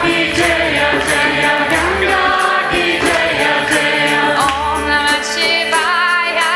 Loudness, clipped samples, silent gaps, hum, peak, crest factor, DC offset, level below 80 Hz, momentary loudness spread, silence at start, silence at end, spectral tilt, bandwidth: -13 LUFS; under 0.1%; none; none; 0 dBFS; 14 dB; under 0.1%; -36 dBFS; 1 LU; 0 s; 0 s; -2.5 dB/octave; 16 kHz